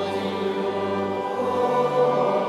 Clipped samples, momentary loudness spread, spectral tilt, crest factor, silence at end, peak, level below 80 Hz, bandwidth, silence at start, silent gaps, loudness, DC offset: under 0.1%; 5 LU; -6.5 dB/octave; 12 dB; 0 s; -10 dBFS; -66 dBFS; 12.5 kHz; 0 s; none; -23 LUFS; under 0.1%